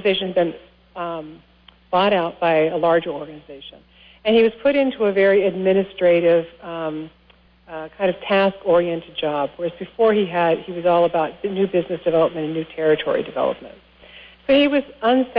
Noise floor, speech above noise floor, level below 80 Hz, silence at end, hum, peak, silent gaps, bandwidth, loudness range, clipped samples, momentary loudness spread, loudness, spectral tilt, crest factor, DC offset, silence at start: -53 dBFS; 34 dB; -56 dBFS; 0 s; 60 Hz at -55 dBFS; -6 dBFS; none; 5.2 kHz; 4 LU; under 0.1%; 16 LU; -19 LUFS; -9 dB/octave; 14 dB; under 0.1%; 0 s